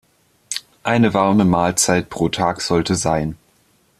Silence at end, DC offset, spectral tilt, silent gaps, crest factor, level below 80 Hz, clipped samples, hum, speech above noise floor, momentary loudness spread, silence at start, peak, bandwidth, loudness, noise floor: 0.65 s; under 0.1%; -4.5 dB/octave; none; 16 dB; -46 dBFS; under 0.1%; none; 42 dB; 13 LU; 0.5 s; -2 dBFS; 15 kHz; -18 LUFS; -58 dBFS